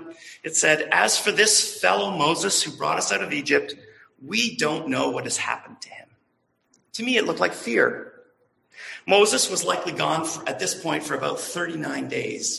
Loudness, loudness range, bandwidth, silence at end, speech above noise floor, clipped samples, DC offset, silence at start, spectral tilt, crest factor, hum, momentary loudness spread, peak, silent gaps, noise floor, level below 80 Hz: -22 LUFS; 7 LU; 13 kHz; 0 s; 47 dB; under 0.1%; under 0.1%; 0 s; -2 dB/octave; 20 dB; none; 17 LU; -4 dBFS; none; -70 dBFS; -68 dBFS